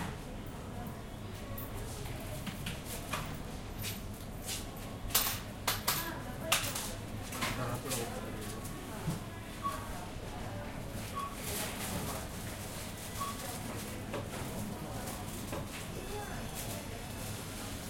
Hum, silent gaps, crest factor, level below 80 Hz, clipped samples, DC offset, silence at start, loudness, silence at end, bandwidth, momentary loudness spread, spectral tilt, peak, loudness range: none; none; 26 dB; -50 dBFS; under 0.1%; under 0.1%; 0 s; -39 LUFS; 0 s; 16.5 kHz; 11 LU; -3.5 dB/octave; -12 dBFS; 7 LU